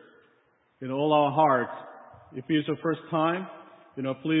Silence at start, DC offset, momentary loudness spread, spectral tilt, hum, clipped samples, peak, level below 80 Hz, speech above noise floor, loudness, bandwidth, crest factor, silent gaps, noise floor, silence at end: 0.8 s; under 0.1%; 20 LU; -10.5 dB/octave; none; under 0.1%; -8 dBFS; -74 dBFS; 41 dB; -27 LUFS; 4 kHz; 18 dB; none; -66 dBFS; 0 s